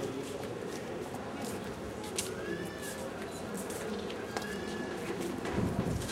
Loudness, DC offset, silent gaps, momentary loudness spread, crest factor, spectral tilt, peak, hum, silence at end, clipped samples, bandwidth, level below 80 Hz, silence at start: -38 LUFS; under 0.1%; none; 6 LU; 24 dB; -4.5 dB/octave; -14 dBFS; none; 0 s; under 0.1%; 16 kHz; -54 dBFS; 0 s